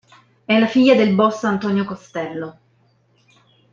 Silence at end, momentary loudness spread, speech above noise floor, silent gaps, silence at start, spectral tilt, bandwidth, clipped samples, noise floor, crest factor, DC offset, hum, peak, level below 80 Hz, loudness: 1.2 s; 15 LU; 42 dB; none; 0.5 s; -6.5 dB/octave; 7.4 kHz; under 0.1%; -59 dBFS; 18 dB; under 0.1%; none; -2 dBFS; -64 dBFS; -17 LUFS